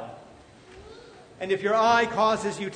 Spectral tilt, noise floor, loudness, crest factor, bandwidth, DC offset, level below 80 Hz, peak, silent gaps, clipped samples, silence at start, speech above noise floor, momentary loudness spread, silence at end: -4 dB/octave; -50 dBFS; -23 LUFS; 18 dB; 9.6 kHz; under 0.1%; -60 dBFS; -8 dBFS; none; under 0.1%; 0 s; 27 dB; 15 LU; 0 s